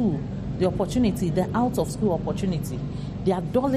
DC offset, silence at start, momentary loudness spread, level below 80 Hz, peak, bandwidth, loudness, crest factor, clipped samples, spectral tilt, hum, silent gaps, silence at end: under 0.1%; 0 s; 7 LU; -40 dBFS; -10 dBFS; 14.5 kHz; -25 LUFS; 14 dB; under 0.1%; -7.5 dB/octave; none; none; 0 s